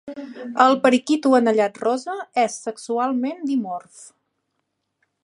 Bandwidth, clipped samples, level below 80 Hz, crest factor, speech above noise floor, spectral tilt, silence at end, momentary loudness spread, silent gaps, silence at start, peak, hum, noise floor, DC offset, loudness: 11 kHz; under 0.1%; -76 dBFS; 20 dB; 55 dB; -4 dB/octave; 1.15 s; 14 LU; none; 0.05 s; -2 dBFS; none; -76 dBFS; under 0.1%; -20 LUFS